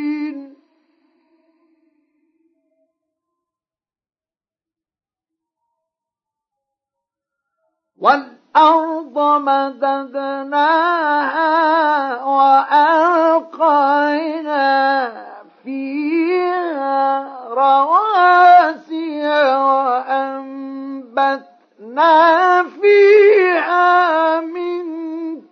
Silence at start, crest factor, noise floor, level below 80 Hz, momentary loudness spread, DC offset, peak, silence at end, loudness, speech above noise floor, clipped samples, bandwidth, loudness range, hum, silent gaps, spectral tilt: 0 s; 16 dB; under -90 dBFS; -88 dBFS; 15 LU; under 0.1%; 0 dBFS; 0.1 s; -14 LUFS; over 76 dB; under 0.1%; 6.6 kHz; 6 LU; none; none; -4 dB/octave